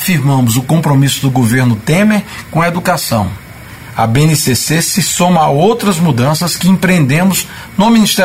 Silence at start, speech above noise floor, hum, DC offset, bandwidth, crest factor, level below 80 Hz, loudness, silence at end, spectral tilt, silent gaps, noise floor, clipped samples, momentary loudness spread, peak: 0 s; 20 dB; none; 0.4%; 16.5 kHz; 10 dB; -40 dBFS; -11 LUFS; 0 s; -5 dB/octave; none; -30 dBFS; under 0.1%; 7 LU; 0 dBFS